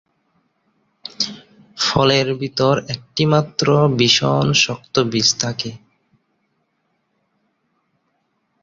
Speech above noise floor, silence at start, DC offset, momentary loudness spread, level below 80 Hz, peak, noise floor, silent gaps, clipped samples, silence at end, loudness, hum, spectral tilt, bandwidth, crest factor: 52 dB; 1.2 s; under 0.1%; 10 LU; -52 dBFS; -2 dBFS; -69 dBFS; none; under 0.1%; 2.85 s; -17 LUFS; none; -4 dB/octave; 7.8 kHz; 18 dB